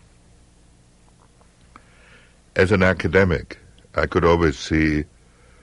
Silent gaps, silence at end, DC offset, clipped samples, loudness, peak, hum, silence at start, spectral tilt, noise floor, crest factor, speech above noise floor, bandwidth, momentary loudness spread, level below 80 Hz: none; 0.6 s; under 0.1%; under 0.1%; -20 LUFS; -4 dBFS; none; 2.55 s; -6.5 dB/octave; -53 dBFS; 18 dB; 35 dB; 11.5 kHz; 13 LU; -38 dBFS